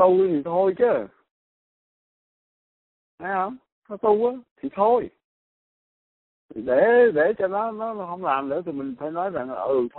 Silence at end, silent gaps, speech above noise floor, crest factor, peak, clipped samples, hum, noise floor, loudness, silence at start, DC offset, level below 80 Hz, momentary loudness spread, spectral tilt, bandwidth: 0 s; 1.31-3.18 s, 3.72-3.82 s, 4.51-4.56 s, 5.24-6.49 s; over 68 dB; 18 dB; -6 dBFS; under 0.1%; none; under -90 dBFS; -23 LUFS; 0 s; under 0.1%; -66 dBFS; 16 LU; -5 dB/octave; 4.1 kHz